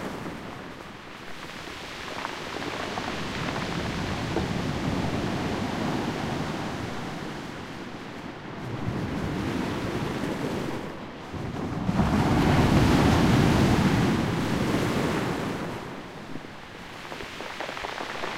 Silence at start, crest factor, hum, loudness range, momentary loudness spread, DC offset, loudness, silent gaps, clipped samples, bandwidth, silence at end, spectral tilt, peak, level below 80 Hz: 0 s; 20 dB; none; 11 LU; 17 LU; 0.1%; -28 LUFS; none; under 0.1%; 16 kHz; 0 s; -6 dB/octave; -8 dBFS; -42 dBFS